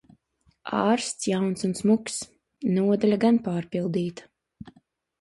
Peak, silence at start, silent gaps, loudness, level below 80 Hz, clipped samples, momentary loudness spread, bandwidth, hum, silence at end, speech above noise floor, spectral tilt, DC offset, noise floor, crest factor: -8 dBFS; 0.65 s; none; -25 LUFS; -64 dBFS; under 0.1%; 11 LU; 11.5 kHz; none; 0.5 s; 43 dB; -5.5 dB/octave; under 0.1%; -67 dBFS; 18 dB